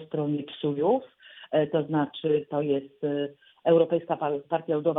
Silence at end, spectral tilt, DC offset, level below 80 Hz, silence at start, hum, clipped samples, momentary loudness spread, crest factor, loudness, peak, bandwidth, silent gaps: 0 s; -10 dB/octave; under 0.1%; -74 dBFS; 0 s; none; under 0.1%; 8 LU; 18 dB; -27 LUFS; -10 dBFS; 4 kHz; none